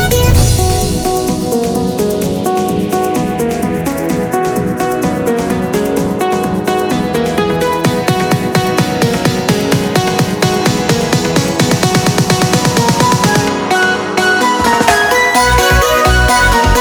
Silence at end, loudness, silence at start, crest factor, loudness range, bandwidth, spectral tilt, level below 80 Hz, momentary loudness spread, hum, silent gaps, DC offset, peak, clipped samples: 0 s; -12 LUFS; 0 s; 12 dB; 5 LU; over 20 kHz; -4.5 dB/octave; -24 dBFS; 6 LU; none; none; under 0.1%; 0 dBFS; under 0.1%